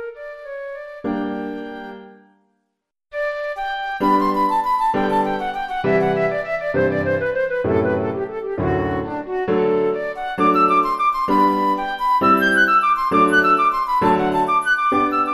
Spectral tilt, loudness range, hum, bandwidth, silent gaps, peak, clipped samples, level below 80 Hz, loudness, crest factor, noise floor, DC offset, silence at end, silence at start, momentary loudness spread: -6.5 dB/octave; 9 LU; none; 13 kHz; none; -4 dBFS; under 0.1%; -46 dBFS; -18 LUFS; 16 dB; -76 dBFS; under 0.1%; 0 s; 0 s; 13 LU